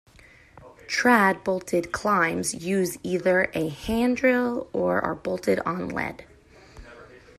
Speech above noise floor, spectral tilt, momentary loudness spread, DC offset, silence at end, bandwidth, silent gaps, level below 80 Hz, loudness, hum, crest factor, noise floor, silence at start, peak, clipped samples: 29 dB; -5 dB/octave; 9 LU; under 0.1%; 0.2 s; 15 kHz; none; -52 dBFS; -24 LUFS; none; 20 dB; -53 dBFS; 0.55 s; -6 dBFS; under 0.1%